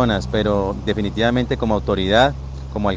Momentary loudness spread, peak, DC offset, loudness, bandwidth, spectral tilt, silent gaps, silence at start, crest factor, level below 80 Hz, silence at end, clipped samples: 7 LU; -2 dBFS; under 0.1%; -19 LUFS; 9.2 kHz; -6.5 dB/octave; none; 0 s; 18 dB; -32 dBFS; 0 s; under 0.1%